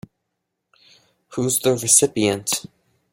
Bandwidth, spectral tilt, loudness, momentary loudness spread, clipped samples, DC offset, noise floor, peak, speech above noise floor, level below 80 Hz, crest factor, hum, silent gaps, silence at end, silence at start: 16.5 kHz; -3 dB/octave; -18 LUFS; 11 LU; under 0.1%; under 0.1%; -78 dBFS; 0 dBFS; 59 dB; -60 dBFS; 22 dB; none; none; 0.5 s; 1.3 s